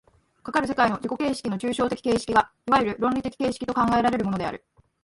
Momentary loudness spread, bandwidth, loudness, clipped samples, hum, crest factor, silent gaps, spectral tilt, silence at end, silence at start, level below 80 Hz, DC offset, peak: 6 LU; 11.5 kHz; -24 LUFS; under 0.1%; none; 20 dB; none; -5.5 dB/octave; 0.45 s; 0.45 s; -52 dBFS; under 0.1%; -6 dBFS